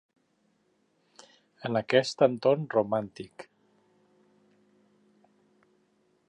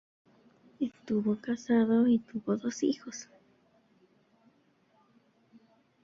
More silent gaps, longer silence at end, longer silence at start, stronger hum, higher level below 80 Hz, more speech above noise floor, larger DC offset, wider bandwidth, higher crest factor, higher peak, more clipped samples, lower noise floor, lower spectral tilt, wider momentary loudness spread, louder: neither; about the same, 2.85 s vs 2.8 s; first, 1.65 s vs 0.8 s; neither; about the same, -76 dBFS vs -74 dBFS; first, 44 dB vs 39 dB; neither; first, 10 kHz vs 7.6 kHz; first, 24 dB vs 18 dB; first, -8 dBFS vs -16 dBFS; neither; about the same, -71 dBFS vs -68 dBFS; about the same, -5.5 dB/octave vs -6 dB/octave; first, 21 LU vs 14 LU; first, -27 LUFS vs -30 LUFS